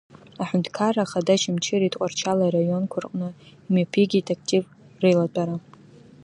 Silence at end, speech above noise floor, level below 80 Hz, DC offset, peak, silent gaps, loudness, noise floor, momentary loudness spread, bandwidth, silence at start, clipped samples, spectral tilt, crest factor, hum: 0.65 s; 26 dB; -68 dBFS; under 0.1%; -6 dBFS; none; -23 LUFS; -48 dBFS; 10 LU; 10.5 kHz; 0.4 s; under 0.1%; -5.5 dB/octave; 18 dB; none